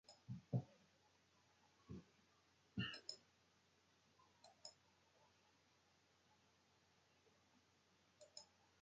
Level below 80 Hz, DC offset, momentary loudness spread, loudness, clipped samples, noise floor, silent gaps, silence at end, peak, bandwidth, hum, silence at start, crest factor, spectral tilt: -80 dBFS; under 0.1%; 14 LU; -53 LUFS; under 0.1%; -78 dBFS; none; 0.35 s; -30 dBFS; 8.4 kHz; none; 0.1 s; 28 dB; -5 dB/octave